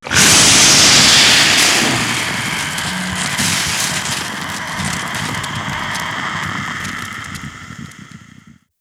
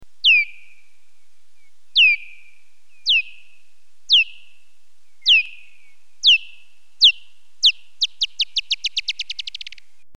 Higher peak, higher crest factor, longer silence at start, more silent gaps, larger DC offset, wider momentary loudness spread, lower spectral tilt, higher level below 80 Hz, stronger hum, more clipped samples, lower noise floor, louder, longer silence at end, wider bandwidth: first, 0 dBFS vs -4 dBFS; about the same, 14 dB vs 18 dB; about the same, 0.05 s vs 0 s; neither; second, under 0.1% vs 2%; first, 19 LU vs 15 LU; first, -1 dB/octave vs 4.5 dB/octave; first, -42 dBFS vs -72 dBFS; neither; neither; second, -44 dBFS vs -64 dBFS; first, -12 LUFS vs -16 LUFS; second, 0.6 s vs 0.85 s; first, over 20 kHz vs 10.5 kHz